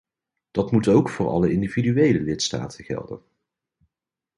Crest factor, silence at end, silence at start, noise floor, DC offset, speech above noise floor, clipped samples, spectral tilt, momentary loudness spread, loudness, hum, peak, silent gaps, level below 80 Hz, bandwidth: 18 dB; 1.2 s; 0.55 s; -88 dBFS; under 0.1%; 67 dB; under 0.1%; -6 dB/octave; 13 LU; -22 LUFS; none; -4 dBFS; none; -50 dBFS; 11.5 kHz